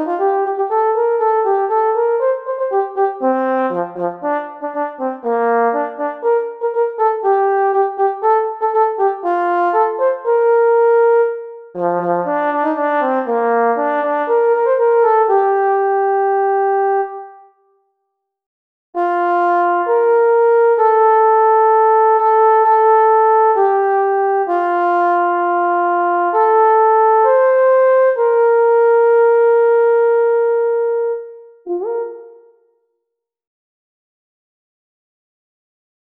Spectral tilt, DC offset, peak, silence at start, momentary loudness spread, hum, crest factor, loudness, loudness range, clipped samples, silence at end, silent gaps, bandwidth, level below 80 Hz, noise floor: -8 dB/octave; under 0.1%; -4 dBFS; 0 s; 9 LU; none; 12 dB; -14 LUFS; 7 LU; under 0.1%; 3.8 s; 18.46-18.93 s; 3.7 kHz; -74 dBFS; -77 dBFS